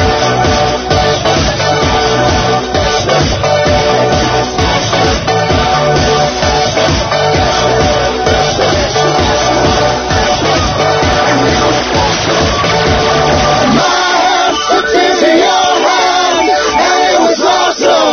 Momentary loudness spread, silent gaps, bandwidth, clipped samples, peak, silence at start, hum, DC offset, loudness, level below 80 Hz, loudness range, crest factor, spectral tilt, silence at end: 2 LU; none; 6.8 kHz; under 0.1%; 0 dBFS; 0 s; none; under 0.1%; -10 LUFS; -24 dBFS; 2 LU; 10 dB; -4 dB/octave; 0 s